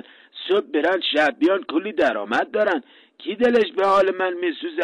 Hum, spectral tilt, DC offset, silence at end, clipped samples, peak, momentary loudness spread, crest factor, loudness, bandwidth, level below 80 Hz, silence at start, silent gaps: none; -4.5 dB/octave; under 0.1%; 0 s; under 0.1%; -8 dBFS; 9 LU; 12 dB; -21 LUFS; 11 kHz; -64 dBFS; 0.35 s; none